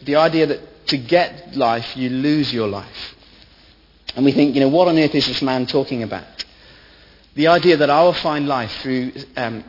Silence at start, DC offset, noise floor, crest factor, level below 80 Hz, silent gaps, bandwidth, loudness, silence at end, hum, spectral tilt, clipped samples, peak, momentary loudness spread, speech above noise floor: 0 s; under 0.1%; -50 dBFS; 18 dB; -52 dBFS; none; 5.8 kHz; -18 LUFS; 0.05 s; none; -6.5 dB/octave; under 0.1%; 0 dBFS; 17 LU; 33 dB